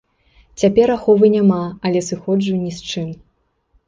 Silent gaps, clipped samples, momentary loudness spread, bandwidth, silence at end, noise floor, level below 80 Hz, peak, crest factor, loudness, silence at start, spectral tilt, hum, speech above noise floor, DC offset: none; under 0.1%; 12 LU; 9.4 kHz; 0.75 s; -64 dBFS; -50 dBFS; -2 dBFS; 16 dB; -17 LUFS; 0.6 s; -6.5 dB/octave; none; 48 dB; under 0.1%